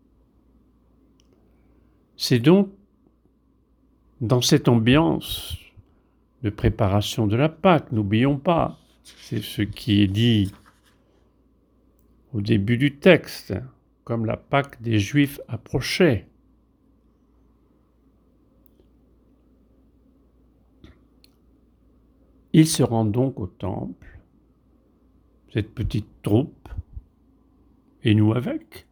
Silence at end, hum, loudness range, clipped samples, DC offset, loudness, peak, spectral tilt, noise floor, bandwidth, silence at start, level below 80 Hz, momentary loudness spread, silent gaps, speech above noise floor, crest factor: 0.1 s; none; 7 LU; under 0.1%; under 0.1%; -22 LUFS; -2 dBFS; -6 dB/octave; -62 dBFS; over 20 kHz; 2.2 s; -46 dBFS; 15 LU; none; 41 dB; 22 dB